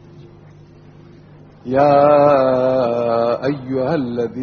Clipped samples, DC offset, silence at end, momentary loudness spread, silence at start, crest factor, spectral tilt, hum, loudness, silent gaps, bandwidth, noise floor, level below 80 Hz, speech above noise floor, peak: under 0.1%; under 0.1%; 0 s; 10 LU; 0.15 s; 16 dB; -6 dB/octave; none; -16 LUFS; none; 6.6 kHz; -43 dBFS; -52 dBFS; 28 dB; 0 dBFS